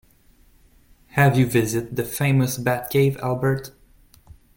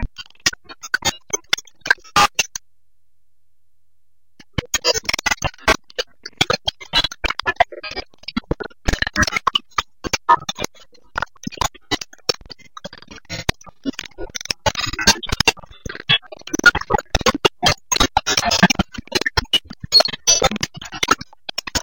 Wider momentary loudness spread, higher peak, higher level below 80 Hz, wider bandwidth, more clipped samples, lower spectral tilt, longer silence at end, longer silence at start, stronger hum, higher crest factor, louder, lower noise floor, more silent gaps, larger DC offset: second, 10 LU vs 15 LU; second, -4 dBFS vs 0 dBFS; second, -50 dBFS vs -36 dBFS; about the same, 17 kHz vs 17 kHz; neither; first, -6 dB/octave vs -2 dB/octave; first, 0.85 s vs 0 s; first, 1.15 s vs 0 s; neither; about the same, 18 dB vs 20 dB; about the same, -21 LUFS vs -19 LUFS; second, -55 dBFS vs -74 dBFS; neither; second, under 0.1% vs 0.6%